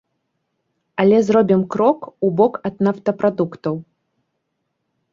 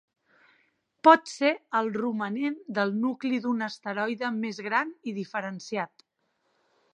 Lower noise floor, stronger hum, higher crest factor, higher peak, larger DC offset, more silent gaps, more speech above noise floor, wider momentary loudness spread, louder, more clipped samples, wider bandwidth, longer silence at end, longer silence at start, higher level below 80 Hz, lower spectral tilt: about the same, -74 dBFS vs -75 dBFS; neither; second, 18 dB vs 26 dB; about the same, -2 dBFS vs -4 dBFS; neither; neither; first, 57 dB vs 48 dB; about the same, 11 LU vs 13 LU; first, -18 LUFS vs -27 LUFS; neither; second, 7.4 kHz vs 9.8 kHz; first, 1.3 s vs 1.1 s; about the same, 1 s vs 1.05 s; first, -62 dBFS vs -82 dBFS; first, -8 dB/octave vs -5 dB/octave